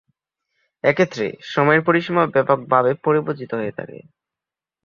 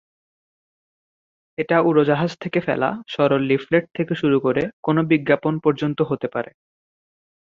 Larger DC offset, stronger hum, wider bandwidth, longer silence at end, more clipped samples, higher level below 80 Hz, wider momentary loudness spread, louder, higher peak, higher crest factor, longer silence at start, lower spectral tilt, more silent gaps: neither; neither; about the same, 7.2 kHz vs 7.2 kHz; second, 0.85 s vs 1.1 s; neither; about the same, -62 dBFS vs -60 dBFS; about the same, 10 LU vs 8 LU; about the same, -19 LUFS vs -20 LUFS; about the same, -2 dBFS vs -2 dBFS; about the same, 20 dB vs 20 dB; second, 0.85 s vs 1.6 s; about the same, -7 dB/octave vs -8 dB/octave; second, none vs 4.73-4.83 s